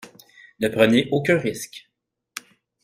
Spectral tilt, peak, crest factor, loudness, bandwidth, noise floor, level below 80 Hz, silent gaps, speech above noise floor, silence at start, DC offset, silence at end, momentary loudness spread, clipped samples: -5 dB/octave; -4 dBFS; 20 dB; -20 LUFS; 16 kHz; -50 dBFS; -58 dBFS; none; 30 dB; 0.05 s; under 0.1%; 0.45 s; 21 LU; under 0.1%